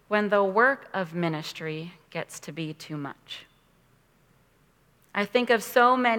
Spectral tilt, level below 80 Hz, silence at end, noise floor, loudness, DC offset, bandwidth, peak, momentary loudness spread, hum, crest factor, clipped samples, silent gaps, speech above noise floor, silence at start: -5 dB/octave; -72 dBFS; 0 s; -63 dBFS; -26 LUFS; under 0.1%; 19 kHz; -6 dBFS; 17 LU; none; 22 dB; under 0.1%; none; 37 dB; 0.1 s